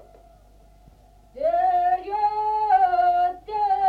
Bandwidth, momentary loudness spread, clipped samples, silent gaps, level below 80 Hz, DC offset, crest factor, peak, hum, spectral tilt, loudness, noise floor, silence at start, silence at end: 5 kHz; 6 LU; under 0.1%; none; -54 dBFS; under 0.1%; 14 dB; -10 dBFS; none; -5.5 dB/octave; -22 LUFS; -52 dBFS; 1.35 s; 0 s